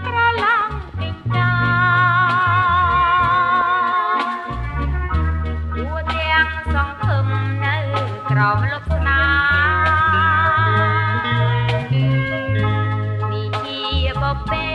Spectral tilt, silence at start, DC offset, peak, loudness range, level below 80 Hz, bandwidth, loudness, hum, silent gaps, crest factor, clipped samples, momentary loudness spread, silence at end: -7 dB/octave; 0 s; under 0.1%; -4 dBFS; 4 LU; -30 dBFS; 6.2 kHz; -18 LUFS; none; none; 14 dB; under 0.1%; 8 LU; 0 s